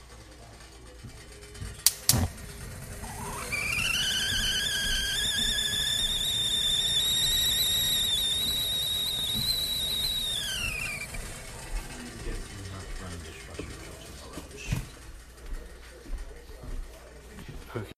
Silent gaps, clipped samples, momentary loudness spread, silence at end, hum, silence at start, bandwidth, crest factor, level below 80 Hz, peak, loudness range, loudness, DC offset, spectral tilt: none; under 0.1%; 23 LU; 0.05 s; none; 0 s; 15.5 kHz; 30 dB; -42 dBFS; 0 dBFS; 17 LU; -26 LUFS; under 0.1%; -1 dB/octave